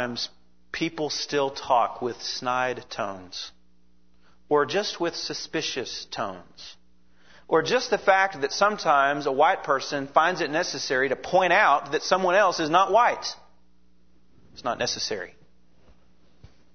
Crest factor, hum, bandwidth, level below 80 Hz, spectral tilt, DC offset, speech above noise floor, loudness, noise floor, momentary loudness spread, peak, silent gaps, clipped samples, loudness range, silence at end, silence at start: 22 dB; none; 6.6 kHz; -64 dBFS; -3 dB/octave; 0.3%; 40 dB; -24 LUFS; -64 dBFS; 14 LU; -4 dBFS; none; under 0.1%; 7 LU; 0.3 s; 0 s